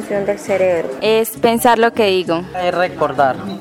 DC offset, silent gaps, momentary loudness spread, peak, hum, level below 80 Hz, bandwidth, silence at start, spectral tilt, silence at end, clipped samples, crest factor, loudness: under 0.1%; none; 7 LU; -2 dBFS; none; -50 dBFS; 17 kHz; 0 s; -4.5 dB/octave; 0 s; under 0.1%; 14 dB; -16 LUFS